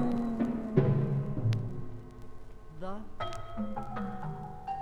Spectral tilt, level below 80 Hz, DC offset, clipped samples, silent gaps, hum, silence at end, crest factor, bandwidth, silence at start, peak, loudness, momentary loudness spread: -9 dB/octave; -48 dBFS; under 0.1%; under 0.1%; none; none; 0 s; 20 dB; 8.6 kHz; 0 s; -12 dBFS; -34 LUFS; 21 LU